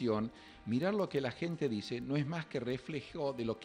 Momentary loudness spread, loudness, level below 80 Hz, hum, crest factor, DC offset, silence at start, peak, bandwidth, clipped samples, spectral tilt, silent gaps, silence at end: 6 LU; -37 LUFS; -66 dBFS; none; 16 dB; under 0.1%; 0 s; -22 dBFS; 10.5 kHz; under 0.1%; -7 dB/octave; none; 0 s